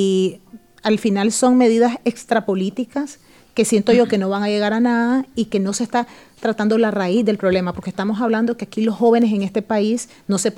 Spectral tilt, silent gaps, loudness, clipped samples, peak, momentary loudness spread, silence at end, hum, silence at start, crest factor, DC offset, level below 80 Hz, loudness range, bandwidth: -5 dB/octave; none; -18 LUFS; under 0.1%; -2 dBFS; 9 LU; 0 s; none; 0 s; 16 dB; under 0.1%; -58 dBFS; 2 LU; 13.5 kHz